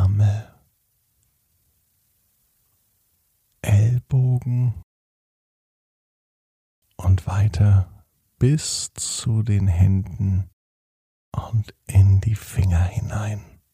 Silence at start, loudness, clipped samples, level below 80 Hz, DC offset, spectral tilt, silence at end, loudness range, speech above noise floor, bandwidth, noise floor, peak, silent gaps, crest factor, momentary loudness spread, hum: 0 s; -21 LUFS; under 0.1%; -40 dBFS; under 0.1%; -6 dB/octave; 0.3 s; 6 LU; 48 dB; 12.5 kHz; -68 dBFS; -6 dBFS; 4.83-6.82 s, 10.53-11.32 s; 16 dB; 12 LU; none